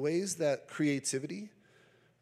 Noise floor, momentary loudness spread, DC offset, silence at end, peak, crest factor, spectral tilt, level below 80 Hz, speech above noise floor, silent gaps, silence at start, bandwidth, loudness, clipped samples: -65 dBFS; 13 LU; under 0.1%; 0.75 s; -20 dBFS; 16 dB; -4.5 dB/octave; -86 dBFS; 32 dB; none; 0 s; 15 kHz; -33 LUFS; under 0.1%